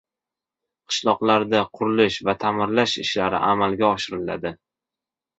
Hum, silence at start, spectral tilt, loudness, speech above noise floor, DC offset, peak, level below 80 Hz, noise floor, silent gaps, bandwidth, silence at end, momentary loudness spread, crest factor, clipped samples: none; 0.9 s; -4.5 dB/octave; -21 LUFS; 67 dB; under 0.1%; -4 dBFS; -56 dBFS; -89 dBFS; none; 8.2 kHz; 0.85 s; 8 LU; 20 dB; under 0.1%